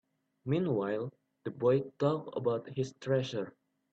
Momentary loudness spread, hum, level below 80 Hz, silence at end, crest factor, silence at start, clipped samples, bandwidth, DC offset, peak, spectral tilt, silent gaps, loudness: 14 LU; none; -74 dBFS; 0.45 s; 18 dB; 0.45 s; under 0.1%; 8 kHz; under 0.1%; -16 dBFS; -7.5 dB/octave; none; -33 LUFS